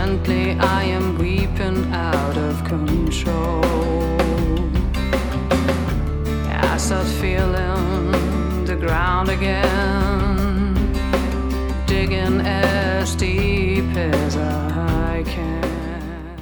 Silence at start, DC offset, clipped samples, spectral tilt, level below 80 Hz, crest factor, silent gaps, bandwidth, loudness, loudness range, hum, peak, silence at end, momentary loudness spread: 0 s; under 0.1%; under 0.1%; -6 dB/octave; -24 dBFS; 16 dB; none; over 20 kHz; -20 LUFS; 1 LU; none; -2 dBFS; 0 s; 5 LU